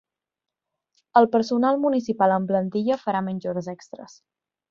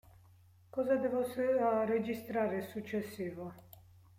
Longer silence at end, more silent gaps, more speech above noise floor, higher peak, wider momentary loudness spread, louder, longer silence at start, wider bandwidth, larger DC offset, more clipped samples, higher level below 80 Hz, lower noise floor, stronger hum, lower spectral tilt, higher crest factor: first, 0.65 s vs 0.4 s; neither; first, 65 dB vs 28 dB; first, -2 dBFS vs -20 dBFS; first, 17 LU vs 11 LU; first, -22 LUFS vs -35 LUFS; first, 1.15 s vs 0.75 s; second, 7.4 kHz vs 16.5 kHz; neither; neither; about the same, -70 dBFS vs -72 dBFS; first, -88 dBFS vs -62 dBFS; neither; about the same, -7 dB/octave vs -7 dB/octave; first, 22 dB vs 16 dB